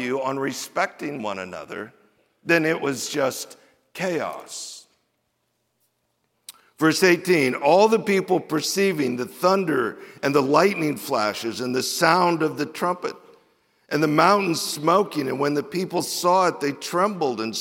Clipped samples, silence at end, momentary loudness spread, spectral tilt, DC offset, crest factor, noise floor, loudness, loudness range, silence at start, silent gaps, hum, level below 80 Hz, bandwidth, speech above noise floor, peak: under 0.1%; 0 s; 15 LU; -4 dB/octave; under 0.1%; 22 dB; -73 dBFS; -22 LUFS; 7 LU; 0 s; none; none; -74 dBFS; 17 kHz; 51 dB; -2 dBFS